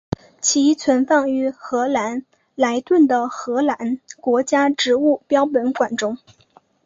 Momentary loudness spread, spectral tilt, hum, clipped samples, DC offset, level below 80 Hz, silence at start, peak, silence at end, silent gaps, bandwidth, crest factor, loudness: 10 LU; -3.5 dB/octave; none; under 0.1%; under 0.1%; -56 dBFS; 0.4 s; -2 dBFS; 0.7 s; none; 7.8 kHz; 18 dB; -19 LUFS